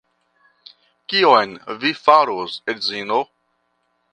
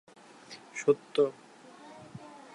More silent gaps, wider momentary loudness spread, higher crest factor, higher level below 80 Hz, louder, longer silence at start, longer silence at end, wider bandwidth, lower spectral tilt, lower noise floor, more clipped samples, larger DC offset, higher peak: neither; second, 12 LU vs 24 LU; about the same, 20 dB vs 22 dB; first, -70 dBFS vs -82 dBFS; first, -18 LUFS vs -30 LUFS; first, 1.1 s vs 0.5 s; first, 0.9 s vs 0.15 s; second, 9.8 kHz vs 11 kHz; about the same, -4 dB/octave vs -5 dB/octave; first, -68 dBFS vs -52 dBFS; neither; neither; first, 0 dBFS vs -12 dBFS